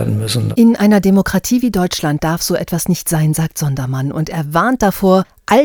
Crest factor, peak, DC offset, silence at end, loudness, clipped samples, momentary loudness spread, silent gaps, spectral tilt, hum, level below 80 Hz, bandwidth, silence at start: 14 dB; 0 dBFS; under 0.1%; 0 s; -15 LUFS; under 0.1%; 8 LU; none; -5.5 dB/octave; none; -38 dBFS; over 20 kHz; 0 s